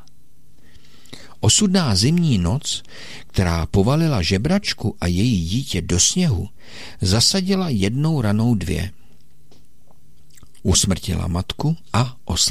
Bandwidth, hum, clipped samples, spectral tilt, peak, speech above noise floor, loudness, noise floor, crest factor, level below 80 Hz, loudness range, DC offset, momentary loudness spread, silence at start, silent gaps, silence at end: 16 kHz; none; under 0.1%; -4.5 dB/octave; -4 dBFS; 36 dB; -19 LUFS; -55 dBFS; 16 dB; -36 dBFS; 4 LU; 2%; 11 LU; 1.1 s; none; 0 s